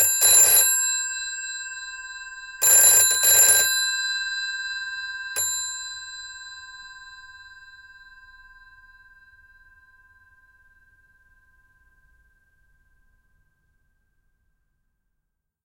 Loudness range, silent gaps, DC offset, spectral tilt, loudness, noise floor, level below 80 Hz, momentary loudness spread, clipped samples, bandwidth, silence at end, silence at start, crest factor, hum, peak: 19 LU; none; under 0.1%; 3 dB/octave; -17 LUFS; -78 dBFS; -62 dBFS; 25 LU; under 0.1%; 16 kHz; 8.15 s; 0 s; 22 dB; none; -4 dBFS